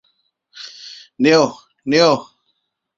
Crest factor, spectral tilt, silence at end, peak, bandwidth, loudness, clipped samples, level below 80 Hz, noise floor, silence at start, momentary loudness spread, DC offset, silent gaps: 18 dB; -4.5 dB/octave; 0.75 s; -2 dBFS; 7.6 kHz; -16 LUFS; under 0.1%; -62 dBFS; -70 dBFS; 0.55 s; 22 LU; under 0.1%; none